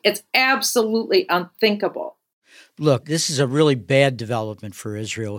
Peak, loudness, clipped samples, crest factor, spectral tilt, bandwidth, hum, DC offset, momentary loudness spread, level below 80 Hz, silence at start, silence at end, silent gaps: 0 dBFS; -20 LUFS; under 0.1%; 20 dB; -4 dB/octave; 17 kHz; none; under 0.1%; 13 LU; -68 dBFS; 0.05 s; 0 s; 2.33-2.42 s